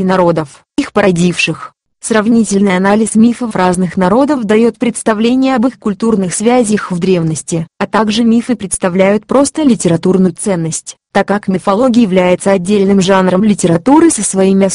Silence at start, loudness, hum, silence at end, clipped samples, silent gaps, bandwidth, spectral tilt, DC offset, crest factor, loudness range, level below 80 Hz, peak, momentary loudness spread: 0 s; -11 LUFS; none; 0 s; 0.2%; none; 11.5 kHz; -5.5 dB/octave; under 0.1%; 10 dB; 3 LU; -44 dBFS; 0 dBFS; 6 LU